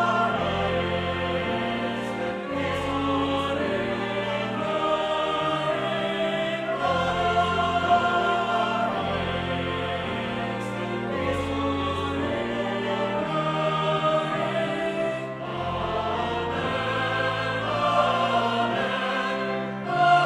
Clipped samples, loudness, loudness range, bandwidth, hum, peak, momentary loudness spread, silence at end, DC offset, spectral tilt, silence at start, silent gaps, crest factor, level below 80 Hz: under 0.1%; -25 LUFS; 3 LU; 12.5 kHz; none; -8 dBFS; 6 LU; 0 s; under 0.1%; -5.5 dB/octave; 0 s; none; 18 dB; -50 dBFS